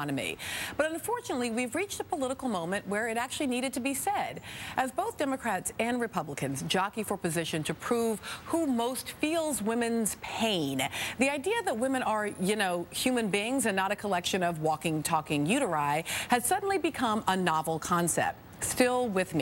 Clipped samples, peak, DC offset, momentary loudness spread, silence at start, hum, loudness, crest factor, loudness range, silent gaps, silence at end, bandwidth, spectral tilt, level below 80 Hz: under 0.1%; -10 dBFS; under 0.1%; 6 LU; 0 s; none; -30 LUFS; 20 dB; 3 LU; none; 0 s; 17 kHz; -3.5 dB/octave; -62 dBFS